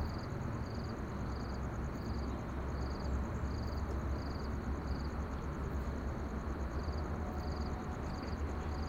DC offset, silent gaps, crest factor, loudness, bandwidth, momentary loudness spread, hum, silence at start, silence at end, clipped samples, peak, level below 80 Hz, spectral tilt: under 0.1%; none; 12 dB; -41 LUFS; 15 kHz; 2 LU; none; 0 s; 0 s; under 0.1%; -26 dBFS; -42 dBFS; -7 dB/octave